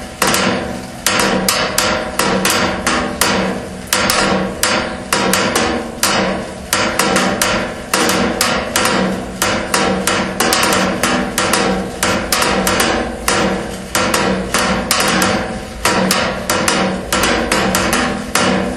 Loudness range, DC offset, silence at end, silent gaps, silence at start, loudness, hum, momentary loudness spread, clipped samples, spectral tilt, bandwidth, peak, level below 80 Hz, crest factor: 1 LU; under 0.1%; 0 s; none; 0 s; -15 LUFS; none; 5 LU; under 0.1%; -3 dB/octave; 17.5 kHz; 0 dBFS; -34 dBFS; 16 dB